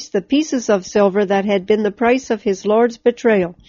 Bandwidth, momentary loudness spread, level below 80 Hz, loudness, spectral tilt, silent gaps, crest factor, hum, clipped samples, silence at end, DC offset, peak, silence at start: 7.4 kHz; 3 LU; -54 dBFS; -17 LUFS; -4.5 dB/octave; none; 14 dB; none; under 0.1%; 0.15 s; under 0.1%; -2 dBFS; 0 s